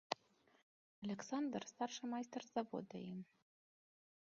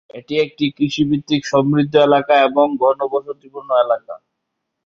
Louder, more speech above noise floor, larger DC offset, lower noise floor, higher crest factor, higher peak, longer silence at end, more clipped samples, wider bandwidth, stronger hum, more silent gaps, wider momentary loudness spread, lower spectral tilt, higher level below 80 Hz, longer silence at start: second, -47 LUFS vs -16 LUFS; second, 28 dB vs 60 dB; neither; about the same, -73 dBFS vs -76 dBFS; first, 28 dB vs 16 dB; second, -20 dBFS vs 0 dBFS; first, 1.1 s vs 0.7 s; neither; about the same, 7.4 kHz vs 7.4 kHz; neither; first, 0.62-1.02 s vs none; about the same, 9 LU vs 11 LU; second, -4.5 dB/octave vs -6 dB/octave; second, -88 dBFS vs -58 dBFS; about the same, 0.1 s vs 0.15 s